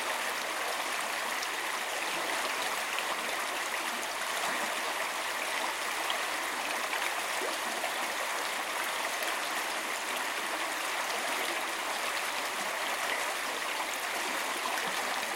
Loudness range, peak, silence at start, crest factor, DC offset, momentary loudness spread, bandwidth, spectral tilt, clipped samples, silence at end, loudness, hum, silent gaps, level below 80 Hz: 0 LU; -14 dBFS; 0 s; 18 dB; under 0.1%; 1 LU; 16.5 kHz; 0.5 dB/octave; under 0.1%; 0 s; -32 LUFS; none; none; -74 dBFS